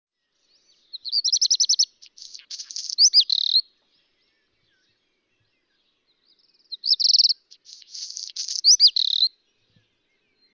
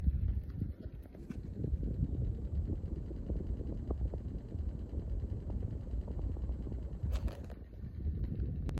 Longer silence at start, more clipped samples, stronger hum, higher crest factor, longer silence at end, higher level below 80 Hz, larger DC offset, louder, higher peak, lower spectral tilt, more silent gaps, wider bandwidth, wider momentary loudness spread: first, 0.95 s vs 0 s; neither; neither; about the same, 18 dB vs 18 dB; first, 1.25 s vs 0 s; second, -86 dBFS vs -40 dBFS; neither; first, -17 LUFS vs -41 LUFS; first, -6 dBFS vs -20 dBFS; second, 7 dB/octave vs -9.5 dB/octave; neither; first, 7.8 kHz vs 5.2 kHz; first, 22 LU vs 8 LU